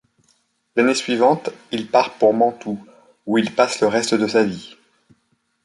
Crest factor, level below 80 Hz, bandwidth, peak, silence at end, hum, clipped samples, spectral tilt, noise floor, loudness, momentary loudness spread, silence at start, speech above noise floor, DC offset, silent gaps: 18 dB; -64 dBFS; 11.5 kHz; -2 dBFS; 0.95 s; none; under 0.1%; -4.5 dB/octave; -67 dBFS; -19 LUFS; 13 LU; 0.75 s; 49 dB; under 0.1%; none